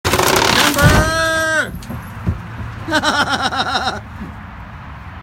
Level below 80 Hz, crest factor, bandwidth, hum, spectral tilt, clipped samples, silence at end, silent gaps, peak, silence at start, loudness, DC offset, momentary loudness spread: -30 dBFS; 18 dB; 17 kHz; none; -3.5 dB/octave; under 0.1%; 0 s; none; 0 dBFS; 0.05 s; -15 LUFS; under 0.1%; 21 LU